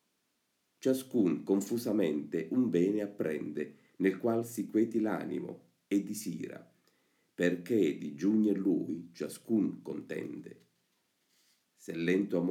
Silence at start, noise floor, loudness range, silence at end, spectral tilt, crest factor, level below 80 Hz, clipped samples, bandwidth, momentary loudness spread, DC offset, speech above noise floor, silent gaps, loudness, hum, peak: 0.85 s; -79 dBFS; 4 LU; 0 s; -6.5 dB/octave; 18 dB; -82 dBFS; under 0.1%; 17 kHz; 14 LU; under 0.1%; 47 dB; none; -33 LUFS; none; -16 dBFS